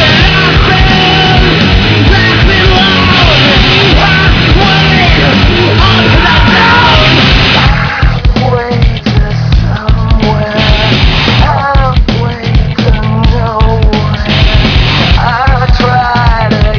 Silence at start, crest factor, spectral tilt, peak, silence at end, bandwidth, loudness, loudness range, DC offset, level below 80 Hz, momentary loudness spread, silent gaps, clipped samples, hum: 0 s; 6 dB; -6 dB/octave; 0 dBFS; 0 s; 5.4 kHz; -6 LUFS; 4 LU; 0.6%; -12 dBFS; 6 LU; none; 4%; none